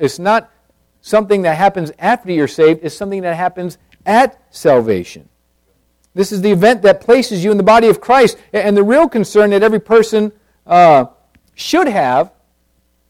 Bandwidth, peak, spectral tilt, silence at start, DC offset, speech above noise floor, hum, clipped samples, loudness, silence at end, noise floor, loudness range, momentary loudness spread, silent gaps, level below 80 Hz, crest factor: 16 kHz; 0 dBFS; -5.5 dB/octave; 0 s; under 0.1%; 48 dB; none; under 0.1%; -12 LUFS; 0.85 s; -59 dBFS; 5 LU; 11 LU; none; -50 dBFS; 12 dB